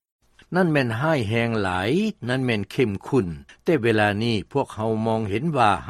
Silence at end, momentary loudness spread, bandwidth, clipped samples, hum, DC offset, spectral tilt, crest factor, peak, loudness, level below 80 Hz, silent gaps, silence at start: 0 s; 5 LU; 13.5 kHz; under 0.1%; none; under 0.1%; -6.5 dB/octave; 18 dB; -4 dBFS; -23 LUFS; -52 dBFS; none; 0.5 s